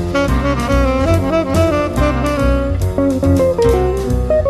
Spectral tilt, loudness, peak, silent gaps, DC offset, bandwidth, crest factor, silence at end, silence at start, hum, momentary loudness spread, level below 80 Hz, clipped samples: -7 dB/octave; -15 LUFS; -2 dBFS; none; under 0.1%; 14 kHz; 12 dB; 0 s; 0 s; none; 3 LU; -20 dBFS; under 0.1%